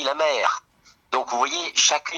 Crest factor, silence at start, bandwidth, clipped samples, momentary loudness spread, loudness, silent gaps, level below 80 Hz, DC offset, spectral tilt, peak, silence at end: 20 dB; 0 s; 12 kHz; under 0.1%; 9 LU; -22 LUFS; none; -70 dBFS; under 0.1%; 1.5 dB/octave; -4 dBFS; 0 s